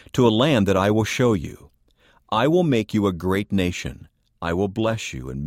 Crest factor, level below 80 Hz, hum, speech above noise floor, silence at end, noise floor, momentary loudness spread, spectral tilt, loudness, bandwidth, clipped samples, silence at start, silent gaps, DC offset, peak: 16 dB; -46 dBFS; none; 38 dB; 0 s; -59 dBFS; 12 LU; -6 dB/octave; -21 LUFS; 16 kHz; under 0.1%; 0.15 s; none; under 0.1%; -6 dBFS